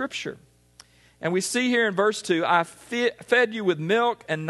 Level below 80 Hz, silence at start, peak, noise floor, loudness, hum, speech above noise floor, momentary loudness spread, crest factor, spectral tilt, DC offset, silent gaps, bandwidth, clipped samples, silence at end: -68 dBFS; 0 s; -4 dBFS; -55 dBFS; -24 LUFS; 60 Hz at -55 dBFS; 31 dB; 9 LU; 20 dB; -4 dB/octave; under 0.1%; none; 12.5 kHz; under 0.1%; 0 s